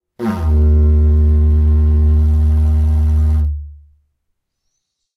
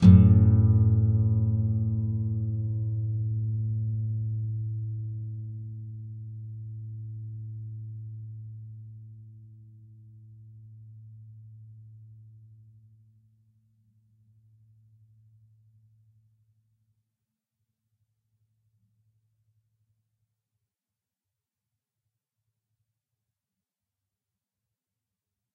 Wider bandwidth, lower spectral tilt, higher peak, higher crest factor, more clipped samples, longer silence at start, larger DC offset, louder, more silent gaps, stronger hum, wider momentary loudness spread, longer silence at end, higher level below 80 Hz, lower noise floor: about the same, 2.2 kHz vs 2.3 kHz; second, -10 dB/octave vs -13.5 dB/octave; about the same, -4 dBFS vs -2 dBFS; second, 10 dB vs 26 dB; neither; first, 0.2 s vs 0 s; neither; first, -14 LUFS vs -26 LUFS; neither; neither; second, 6 LU vs 28 LU; second, 1.4 s vs 13.4 s; first, -14 dBFS vs -50 dBFS; second, -71 dBFS vs under -90 dBFS